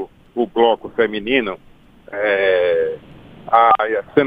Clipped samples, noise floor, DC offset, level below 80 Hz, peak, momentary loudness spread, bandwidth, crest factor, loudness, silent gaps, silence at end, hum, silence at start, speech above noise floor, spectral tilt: under 0.1%; -41 dBFS; under 0.1%; -52 dBFS; 0 dBFS; 14 LU; 4.9 kHz; 18 dB; -17 LUFS; none; 0 s; none; 0 s; 24 dB; -7 dB/octave